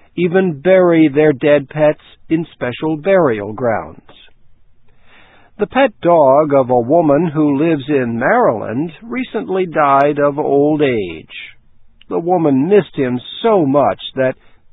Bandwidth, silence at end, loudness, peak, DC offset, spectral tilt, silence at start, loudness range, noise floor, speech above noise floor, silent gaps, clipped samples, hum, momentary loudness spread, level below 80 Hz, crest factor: 4 kHz; 0.4 s; -14 LUFS; 0 dBFS; under 0.1%; -10 dB/octave; 0.15 s; 5 LU; -44 dBFS; 30 dB; none; under 0.1%; none; 11 LU; -52 dBFS; 14 dB